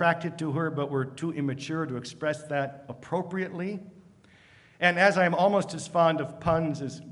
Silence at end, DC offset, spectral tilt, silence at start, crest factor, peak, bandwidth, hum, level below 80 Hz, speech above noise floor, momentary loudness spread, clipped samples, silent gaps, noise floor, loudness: 0 s; under 0.1%; -6 dB/octave; 0 s; 22 dB; -6 dBFS; 11.5 kHz; none; -60 dBFS; 29 dB; 13 LU; under 0.1%; none; -57 dBFS; -28 LUFS